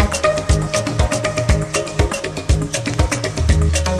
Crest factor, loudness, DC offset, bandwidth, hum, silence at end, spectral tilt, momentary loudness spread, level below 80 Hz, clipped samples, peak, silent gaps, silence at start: 16 dB; -18 LUFS; under 0.1%; 13 kHz; none; 0 s; -4.5 dB/octave; 4 LU; -22 dBFS; under 0.1%; 0 dBFS; none; 0 s